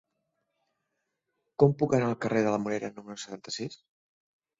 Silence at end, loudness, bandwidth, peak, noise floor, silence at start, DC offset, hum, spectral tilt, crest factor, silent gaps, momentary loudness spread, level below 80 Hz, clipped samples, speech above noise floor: 0.85 s; -28 LUFS; 7.8 kHz; -6 dBFS; -82 dBFS; 1.6 s; under 0.1%; none; -6.5 dB/octave; 24 dB; none; 16 LU; -68 dBFS; under 0.1%; 54 dB